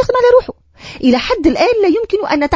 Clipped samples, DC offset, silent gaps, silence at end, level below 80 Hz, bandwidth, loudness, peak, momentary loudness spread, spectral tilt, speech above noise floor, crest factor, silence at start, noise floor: under 0.1%; under 0.1%; none; 0 s; -38 dBFS; 7.8 kHz; -13 LUFS; 0 dBFS; 7 LU; -5.5 dB/octave; 22 dB; 12 dB; 0 s; -34 dBFS